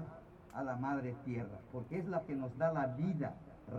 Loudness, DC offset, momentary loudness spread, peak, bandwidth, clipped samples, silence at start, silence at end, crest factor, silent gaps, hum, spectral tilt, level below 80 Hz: -40 LUFS; under 0.1%; 13 LU; -22 dBFS; 8 kHz; under 0.1%; 0 s; 0 s; 18 dB; none; none; -9.5 dB/octave; -66 dBFS